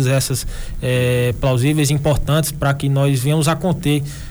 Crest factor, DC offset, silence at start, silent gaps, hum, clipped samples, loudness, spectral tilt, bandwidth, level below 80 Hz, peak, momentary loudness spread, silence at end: 14 dB; under 0.1%; 0 s; none; none; under 0.1%; -17 LUFS; -5.5 dB/octave; over 20 kHz; -30 dBFS; -4 dBFS; 5 LU; 0 s